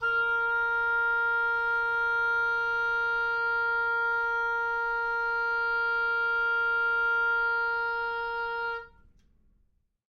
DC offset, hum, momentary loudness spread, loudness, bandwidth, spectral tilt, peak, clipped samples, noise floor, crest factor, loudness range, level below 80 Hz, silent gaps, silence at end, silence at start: under 0.1%; none; 5 LU; -27 LUFS; 6.4 kHz; -2.5 dB/octave; -20 dBFS; under 0.1%; -70 dBFS; 8 dB; 2 LU; -58 dBFS; none; 1.3 s; 0 s